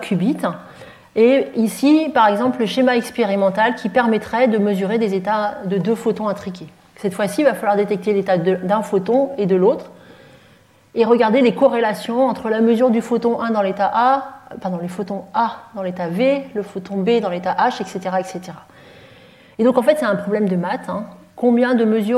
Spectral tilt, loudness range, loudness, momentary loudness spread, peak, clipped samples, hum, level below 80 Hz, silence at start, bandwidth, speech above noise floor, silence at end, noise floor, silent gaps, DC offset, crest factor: -6.5 dB/octave; 5 LU; -18 LUFS; 12 LU; -2 dBFS; under 0.1%; none; -62 dBFS; 0 s; 14.5 kHz; 33 dB; 0 s; -51 dBFS; none; under 0.1%; 16 dB